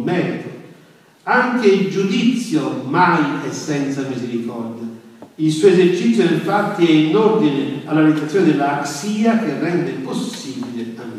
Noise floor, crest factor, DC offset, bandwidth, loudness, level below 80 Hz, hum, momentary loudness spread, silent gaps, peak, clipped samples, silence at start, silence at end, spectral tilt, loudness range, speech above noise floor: -48 dBFS; 16 dB; under 0.1%; 14 kHz; -17 LUFS; -70 dBFS; none; 13 LU; none; 0 dBFS; under 0.1%; 0 s; 0 s; -6 dB/octave; 4 LU; 31 dB